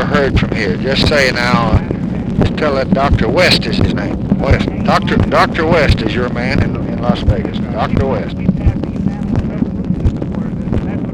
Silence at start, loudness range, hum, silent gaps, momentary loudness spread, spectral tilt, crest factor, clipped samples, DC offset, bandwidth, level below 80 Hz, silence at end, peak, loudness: 0 s; 4 LU; none; none; 7 LU; -6.5 dB/octave; 12 dB; under 0.1%; under 0.1%; 13.5 kHz; -24 dBFS; 0 s; -2 dBFS; -14 LUFS